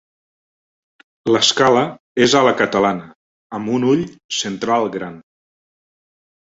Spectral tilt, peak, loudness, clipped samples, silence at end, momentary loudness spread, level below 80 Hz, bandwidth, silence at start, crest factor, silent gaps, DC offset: -3.5 dB/octave; 0 dBFS; -17 LUFS; under 0.1%; 1.25 s; 15 LU; -58 dBFS; 8 kHz; 1.25 s; 20 dB; 2.00-2.15 s, 3.15-3.50 s, 4.24-4.29 s; under 0.1%